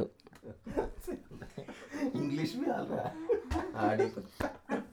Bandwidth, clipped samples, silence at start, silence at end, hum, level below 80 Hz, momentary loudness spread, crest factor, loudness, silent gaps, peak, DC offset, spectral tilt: 19.5 kHz; under 0.1%; 0 s; 0 s; none; -52 dBFS; 15 LU; 20 dB; -36 LUFS; none; -16 dBFS; under 0.1%; -6.5 dB/octave